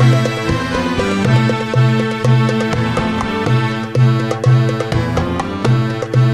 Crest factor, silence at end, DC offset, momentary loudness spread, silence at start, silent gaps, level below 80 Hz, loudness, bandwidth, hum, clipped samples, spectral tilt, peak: 14 dB; 0 s; 0.3%; 4 LU; 0 s; none; -36 dBFS; -15 LUFS; 10.5 kHz; none; under 0.1%; -7 dB/octave; 0 dBFS